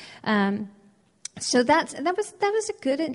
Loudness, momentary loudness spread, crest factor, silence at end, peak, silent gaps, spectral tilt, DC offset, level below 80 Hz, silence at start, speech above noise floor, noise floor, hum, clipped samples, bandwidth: -25 LUFS; 16 LU; 18 dB; 0 s; -8 dBFS; none; -4 dB/octave; under 0.1%; -64 dBFS; 0 s; 21 dB; -45 dBFS; none; under 0.1%; 11.5 kHz